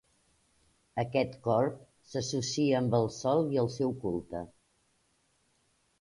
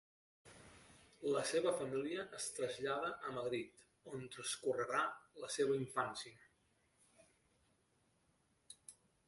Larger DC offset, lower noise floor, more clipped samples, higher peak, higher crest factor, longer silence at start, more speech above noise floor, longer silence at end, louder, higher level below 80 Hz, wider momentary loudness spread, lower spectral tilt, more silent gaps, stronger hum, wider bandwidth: neither; second, -72 dBFS vs -78 dBFS; neither; first, -14 dBFS vs -24 dBFS; about the same, 18 dB vs 20 dB; first, 0.95 s vs 0.45 s; first, 42 dB vs 37 dB; first, 1.55 s vs 0.35 s; first, -31 LUFS vs -41 LUFS; first, -62 dBFS vs -80 dBFS; second, 12 LU vs 22 LU; first, -6 dB/octave vs -3.5 dB/octave; neither; neither; about the same, 11.5 kHz vs 11.5 kHz